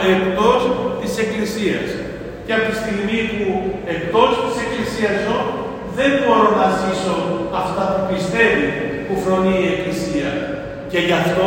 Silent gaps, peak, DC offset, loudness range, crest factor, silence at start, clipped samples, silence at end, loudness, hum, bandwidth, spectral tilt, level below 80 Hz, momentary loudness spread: none; 0 dBFS; under 0.1%; 3 LU; 18 dB; 0 s; under 0.1%; 0 s; -18 LUFS; none; 16.5 kHz; -5.5 dB/octave; -42 dBFS; 9 LU